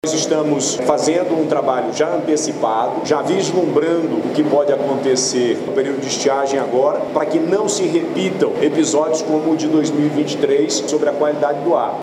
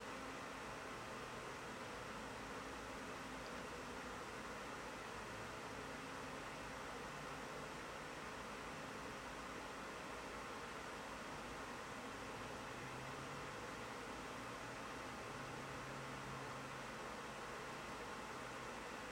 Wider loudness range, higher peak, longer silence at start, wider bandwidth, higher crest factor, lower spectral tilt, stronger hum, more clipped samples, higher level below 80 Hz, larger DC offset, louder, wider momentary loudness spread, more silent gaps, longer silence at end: about the same, 1 LU vs 0 LU; first, 0 dBFS vs -36 dBFS; about the same, 0.05 s vs 0 s; second, 12.5 kHz vs 16 kHz; about the same, 16 dB vs 14 dB; about the same, -4 dB/octave vs -3.5 dB/octave; neither; neither; about the same, -64 dBFS vs -66 dBFS; neither; first, -17 LUFS vs -49 LUFS; about the same, 3 LU vs 1 LU; neither; about the same, 0 s vs 0 s